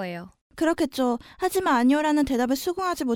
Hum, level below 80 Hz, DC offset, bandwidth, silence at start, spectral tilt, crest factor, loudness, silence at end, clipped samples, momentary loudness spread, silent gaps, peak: none; -52 dBFS; under 0.1%; 19.5 kHz; 0 s; -4.5 dB/octave; 16 dB; -24 LUFS; 0 s; under 0.1%; 9 LU; 0.41-0.50 s; -8 dBFS